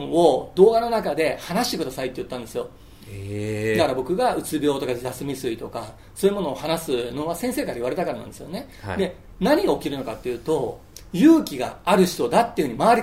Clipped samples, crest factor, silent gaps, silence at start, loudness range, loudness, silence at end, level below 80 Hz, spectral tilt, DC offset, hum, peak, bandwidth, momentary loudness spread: under 0.1%; 20 dB; none; 0 s; 5 LU; -23 LUFS; 0 s; -48 dBFS; -5.5 dB/octave; 0.2%; none; -2 dBFS; 16 kHz; 15 LU